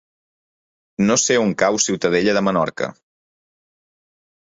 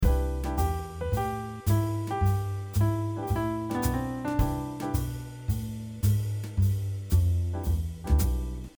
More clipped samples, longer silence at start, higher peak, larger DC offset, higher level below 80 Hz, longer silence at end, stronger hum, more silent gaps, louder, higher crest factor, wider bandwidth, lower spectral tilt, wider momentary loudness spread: neither; first, 1 s vs 0 s; first, -2 dBFS vs -12 dBFS; neither; second, -58 dBFS vs -32 dBFS; first, 1.55 s vs 0.1 s; neither; neither; first, -18 LUFS vs -29 LUFS; about the same, 20 dB vs 16 dB; second, 8 kHz vs over 20 kHz; second, -3.5 dB/octave vs -7 dB/octave; first, 11 LU vs 6 LU